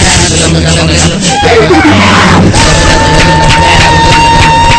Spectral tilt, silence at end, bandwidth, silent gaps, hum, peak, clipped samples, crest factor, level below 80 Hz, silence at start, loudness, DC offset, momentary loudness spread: -4 dB/octave; 0 s; 11 kHz; none; none; 0 dBFS; 10%; 4 dB; -14 dBFS; 0 s; -4 LUFS; 0.8%; 3 LU